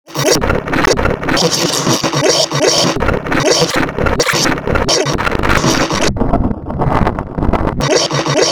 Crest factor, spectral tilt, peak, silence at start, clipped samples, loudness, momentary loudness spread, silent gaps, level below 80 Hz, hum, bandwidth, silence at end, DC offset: 14 dB; -3.5 dB/octave; 0 dBFS; 0.05 s; 0.1%; -13 LUFS; 5 LU; none; -26 dBFS; none; over 20 kHz; 0 s; 4%